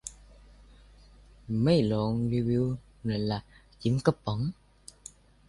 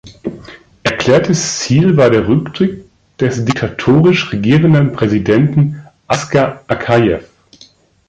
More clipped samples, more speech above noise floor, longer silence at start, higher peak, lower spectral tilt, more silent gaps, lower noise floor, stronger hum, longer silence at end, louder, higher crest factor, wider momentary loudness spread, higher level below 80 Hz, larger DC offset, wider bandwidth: neither; second, 27 dB vs 34 dB; about the same, 0.05 s vs 0.05 s; second, -8 dBFS vs 0 dBFS; about the same, -7 dB/octave vs -6 dB/octave; neither; first, -55 dBFS vs -46 dBFS; first, 50 Hz at -50 dBFS vs none; about the same, 0.95 s vs 0.85 s; second, -29 LUFS vs -13 LUFS; first, 22 dB vs 12 dB; first, 22 LU vs 10 LU; second, -52 dBFS vs -42 dBFS; neither; first, 11.5 kHz vs 9 kHz